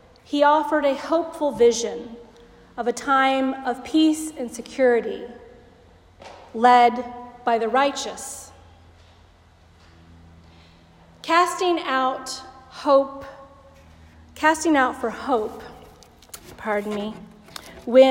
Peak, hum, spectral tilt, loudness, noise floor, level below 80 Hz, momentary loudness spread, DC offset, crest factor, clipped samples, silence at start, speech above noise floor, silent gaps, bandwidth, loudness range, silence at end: -2 dBFS; none; -3.5 dB/octave; -21 LUFS; -53 dBFS; -58 dBFS; 21 LU; under 0.1%; 20 dB; under 0.1%; 0.3 s; 32 dB; none; 16 kHz; 6 LU; 0 s